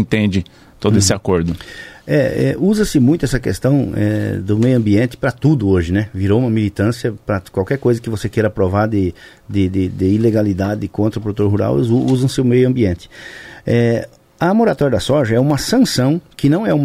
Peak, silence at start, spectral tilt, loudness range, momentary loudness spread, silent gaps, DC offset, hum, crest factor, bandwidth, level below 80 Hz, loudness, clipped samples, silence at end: -2 dBFS; 0 s; -6.5 dB/octave; 2 LU; 8 LU; none; under 0.1%; none; 12 dB; 15.5 kHz; -38 dBFS; -16 LUFS; under 0.1%; 0 s